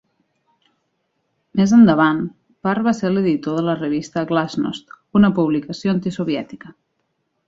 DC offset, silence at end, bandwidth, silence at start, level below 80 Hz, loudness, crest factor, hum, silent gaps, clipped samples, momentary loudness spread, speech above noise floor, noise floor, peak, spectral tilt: under 0.1%; 0.75 s; 7.8 kHz; 1.55 s; -54 dBFS; -18 LUFS; 16 dB; none; none; under 0.1%; 14 LU; 53 dB; -71 dBFS; -2 dBFS; -7 dB/octave